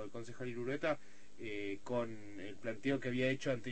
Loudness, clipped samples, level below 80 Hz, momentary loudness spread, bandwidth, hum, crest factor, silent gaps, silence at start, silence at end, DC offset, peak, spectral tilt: -40 LUFS; under 0.1%; -70 dBFS; 12 LU; 8.4 kHz; none; 18 dB; none; 0 s; 0 s; 0.5%; -22 dBFS; -6 dB/octave